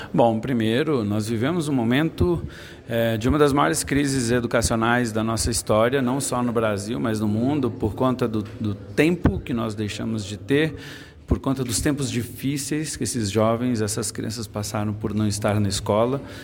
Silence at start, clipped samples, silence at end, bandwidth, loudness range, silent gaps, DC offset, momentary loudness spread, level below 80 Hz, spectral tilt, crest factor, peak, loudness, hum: 0 s; under 0.1%; 0 s; 17 kHz; 4 LU; none; under 0.1%; 8 LU; -40 dBFS; -5 dB/octave; 18 dB; -4 dBFS; -23 LUFS; none